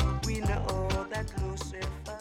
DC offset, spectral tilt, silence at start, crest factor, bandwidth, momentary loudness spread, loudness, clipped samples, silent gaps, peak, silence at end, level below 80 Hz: under 0.1%; -5.5 dB/octave; 0 s; 16 dB; 16 kHz; 6 LU; -33 LUFS; under 0.1%; none; -16 dBFS; 0 s; -36 dBFS